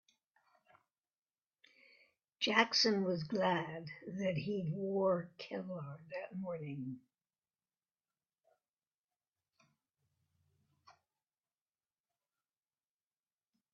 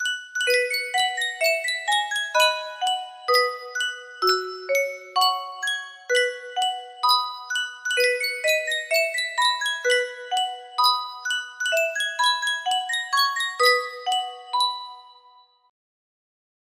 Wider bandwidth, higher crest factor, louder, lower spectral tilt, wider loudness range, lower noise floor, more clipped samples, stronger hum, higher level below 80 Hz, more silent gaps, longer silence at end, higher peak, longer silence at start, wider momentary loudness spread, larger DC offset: second, 7 kHz vs 16 kHz; first, 28 dB vs 20 dB; second, -37 LUFS vs -23 LUFS; first, -3 dB/octave vs 2 dB/octave; first, 14 LU vs 2 LU; first, under -90 dBFS vs -55 dBFS; neither; neither; about the same, -82 dBFS vs -78 dBFS; first, 8.69-8.77 s, 8.87-9.08 s, 9.16-9.20 s vs none; first, 2.8 s vs 1.55 s; second, -14 dBFS vs -4 dBFS; first, 2.4 s vs 0 s; first, 16 LU vs 7 LU; neither